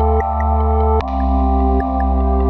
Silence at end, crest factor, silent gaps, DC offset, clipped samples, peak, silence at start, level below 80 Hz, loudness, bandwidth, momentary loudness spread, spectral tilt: 0 s; 12 dB; none; under 0.1%; under 0.1%; -4 dBFS; 0 s; -16 dBFS; -17 LUFS; 4.3 kHz; 2 LU; -10.5 dB/octave